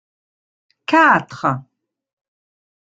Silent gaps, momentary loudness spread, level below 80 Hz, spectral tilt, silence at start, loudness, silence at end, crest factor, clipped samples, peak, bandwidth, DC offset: none; 16 LU; -62 dBFS; -6 dB/octave; 0.9 s; -15 LUFS; 1.3 s; 18 dB; under 0.1%; -2 dBFS; 9 kHz; under 0.1%